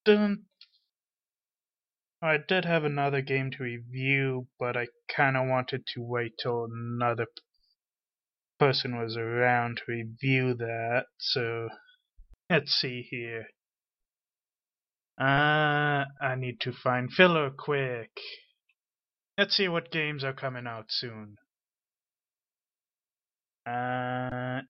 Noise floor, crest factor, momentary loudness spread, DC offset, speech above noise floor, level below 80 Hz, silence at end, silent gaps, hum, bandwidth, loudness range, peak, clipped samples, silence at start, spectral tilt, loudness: under -90 dBFS; 24 dB; 12 LU; under 0.1%; over 61 dB; -68 dBFS; 0.05 s; none; none; 6 kHz; 7 LU; -6 dBFS; under 0.1%; 0.05 s; -3.5 dB/octave; -29 LUFS